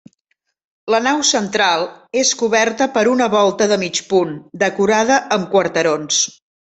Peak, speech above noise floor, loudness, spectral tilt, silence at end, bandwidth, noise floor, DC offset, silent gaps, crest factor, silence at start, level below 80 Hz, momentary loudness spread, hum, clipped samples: -2 dBFS; 54 dB; -16 LUFS; -2.5 dB/octave; 0.45 s; 8.4 kHz; -70 dBFS; under 0.1%; none; 14 dB; 0.85 s; -60 dBFS; 6 LU; none; under 0.1%